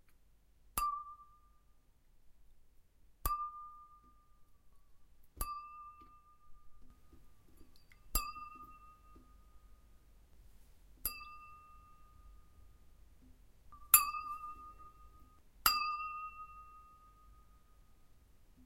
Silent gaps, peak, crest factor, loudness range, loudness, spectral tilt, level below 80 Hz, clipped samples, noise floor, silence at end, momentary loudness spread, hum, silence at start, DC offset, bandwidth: none; -8 dBFS; 36 dB; 17 LU; -36 LUFS; 0 dB/octave; -56 dBFS; under 0.1%; -66 dBFS; 0.05 s; 28 LU; none; 0.1 s; under 0.1%; 16 kHz